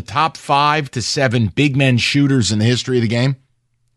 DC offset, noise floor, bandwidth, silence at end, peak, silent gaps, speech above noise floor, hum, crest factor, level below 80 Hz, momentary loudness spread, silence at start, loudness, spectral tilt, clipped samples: under 0.1%; -63 dBFS; 12 kHz; 0.6 s; -2 dBFS; none; 48 dB; none; 14 dB; -50 dBFS; 5 LU; 0 s; -16 LUFS; -5 dB/octave; under 0.1%